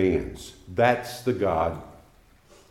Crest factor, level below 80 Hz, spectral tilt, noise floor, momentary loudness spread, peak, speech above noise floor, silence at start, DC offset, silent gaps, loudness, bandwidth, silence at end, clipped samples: 20 dB; -48 dBFS; -6 dB/octave; -56 dBFS; 16 LU; -6 dBFS; 31 dB; 0 s; under 0.1%; none; -25 LUFS; 16 kHz; 0.75 s; under 0.1%